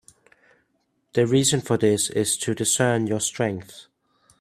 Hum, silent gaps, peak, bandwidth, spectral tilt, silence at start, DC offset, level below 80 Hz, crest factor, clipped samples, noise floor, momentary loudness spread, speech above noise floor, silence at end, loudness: none; none; -6 dBFS; 16 kHz; -4 dB/octave; 1.15 s; under 0.1%; -62 dBFS; 18 dB; under 0.1%; -71 dBFS; 8 LU; 49 dB; 0.6 s; -22 LUFS